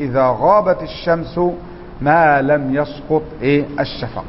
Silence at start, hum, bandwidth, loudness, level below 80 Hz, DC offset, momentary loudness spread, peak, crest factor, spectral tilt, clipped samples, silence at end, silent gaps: 0 s; none; 5.8 kHz; -16 LUFS; -40 dBFS; under 0.1%; 9 LU; 0 dBFS; 16 dB; -10.5 dB/octave; under 0.1%; 0 s; none